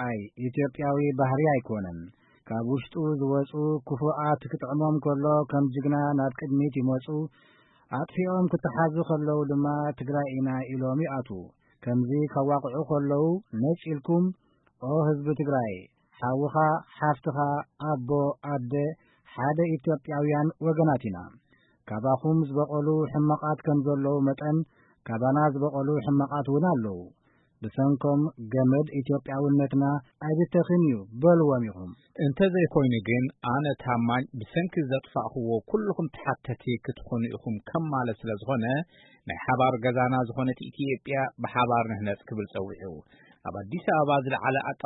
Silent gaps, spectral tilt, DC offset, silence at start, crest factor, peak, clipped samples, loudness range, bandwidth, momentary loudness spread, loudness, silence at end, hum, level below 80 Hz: none; -12 dB/octave; under 0.1%; 0 s; 18 dB; -10 dBFS; under 0.1%; 4 LU; 4 kHz; 10 LU; -27 LUFS; 0.1 s; none; -62 dBFS